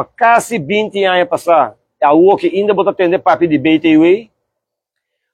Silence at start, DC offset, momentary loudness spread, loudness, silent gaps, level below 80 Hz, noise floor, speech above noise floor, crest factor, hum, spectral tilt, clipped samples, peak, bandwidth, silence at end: 0 s; under 0.1%; 6 LU; -12 LUFS; none; -56 dBFS; -77 dBFS; 66 dB; 12 dB; none; -5.5 dB/octave; under 0.1%; 0 dBFS; 14 kHz; 1.1 s